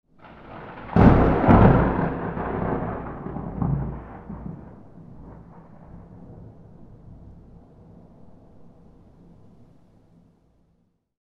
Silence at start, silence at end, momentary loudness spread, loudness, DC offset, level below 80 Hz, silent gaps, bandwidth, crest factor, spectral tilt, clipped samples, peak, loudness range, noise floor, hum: 0.3 s; 3.9 s; 29 LU; -21 LUFS; under 0.1%; -34 dBFS; none; 5.4 kHz; 24 dB; -10.5 dB/octave; under 0.1%; 0 dBFS; 26 LU; -67 dBFS; none